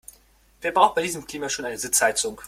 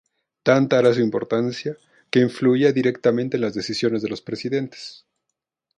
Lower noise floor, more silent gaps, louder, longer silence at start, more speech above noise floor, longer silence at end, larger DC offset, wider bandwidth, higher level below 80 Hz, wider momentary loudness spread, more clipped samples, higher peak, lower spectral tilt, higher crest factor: second, -57 dBFS vs -81 dBFS; neither; about the same, -23 LUFS vs -21 LUFS; first, 0.6 s vs 0.45 s; second, 34 dB vs 61 dB; second, 0 s vs 0.85 s; neither; first, 16.5 kHz vs 10.5 kHz; first, -58 dBFS vs -64 dBFS; second, 10 LU vs 14 LU; neither; about the same, -2 dBFS vs -2 dBFS; second, -1.5 dB/octave vs -6.5 dB/octave; about the same, 22 dB vs 18 dB